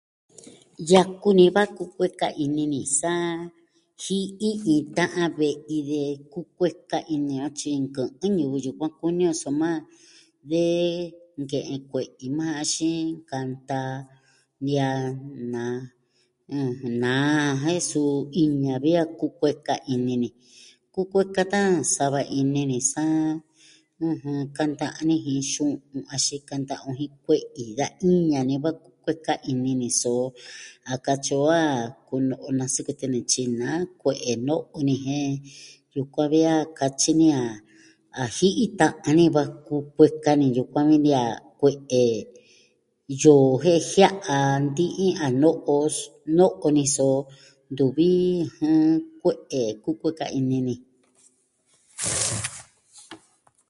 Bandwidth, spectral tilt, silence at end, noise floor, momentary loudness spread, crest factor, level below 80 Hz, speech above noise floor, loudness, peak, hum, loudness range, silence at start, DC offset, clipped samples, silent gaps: 11.5 kHz; -5 dB/octave; 0.55 s; -68 dBFS; 13 LU; 22 dB; -64 dBFS; 45 dB; -24 LUFS; -2 dBFS; none; 7 LU; 0.45 s; under 0.1%; under 0.1%; none